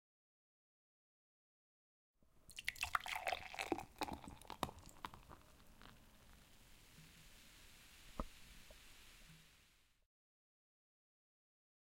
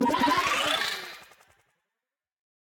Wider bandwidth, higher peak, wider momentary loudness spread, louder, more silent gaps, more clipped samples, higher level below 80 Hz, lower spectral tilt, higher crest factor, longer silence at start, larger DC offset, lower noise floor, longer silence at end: about the same, 16.5 kHz vs 17.5 kHz; second, -20 dBFS vs -12 dBFS; first, 23 LU vs 18 LU; second, -47 LUFS vs -25 LUFS; neither; neither; about the same, -66 dBFS vs -62 dBFS; about the same, -3 dB/octave vs -2.5 dB/octave; first, 32 dB vs 18 dB; first, 2.2 s vs 0 s; neither; second, -73 dBFS vs -89 dBFS; first, 2.05 s vs 1.35 s